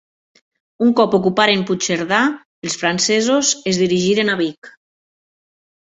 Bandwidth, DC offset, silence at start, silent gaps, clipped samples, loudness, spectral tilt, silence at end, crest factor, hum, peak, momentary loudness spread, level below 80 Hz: 8.2 kHz; under 0.1%; 0.8 s; 2.45-2.62 s, 4.58-4.62 s; under 0.1%; -16 LUFS; -3.5 dB/octave; 1.15 s; 18 dB; none; 0 dBFS; 6 LU; -58 dBFS